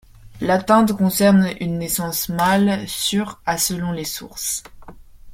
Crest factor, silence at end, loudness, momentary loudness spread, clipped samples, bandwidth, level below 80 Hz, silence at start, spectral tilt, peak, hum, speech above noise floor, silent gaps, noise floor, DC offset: 18 dB; 0 s; -19 LUFS; 10 LU; under 0.1%; 16.5 kHz; -46 dBFS; 0.25 s; -4.5 dB/octave; -2 dBFS; none; 21 dB; none; -40 dBFS; under 0.1%